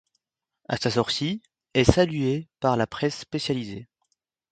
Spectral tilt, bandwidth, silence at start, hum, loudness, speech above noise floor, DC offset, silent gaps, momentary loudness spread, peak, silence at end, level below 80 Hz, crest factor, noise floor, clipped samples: -5.5 dB/octave; 9.2 kHz; 0.7 s; none; -25 LUFS; 54 dB; under 0.1%; none; 11 LU; 0 dBFS; 0.7 s; -44 dBFS; 26 dB; -78 dBFS; under 0.1%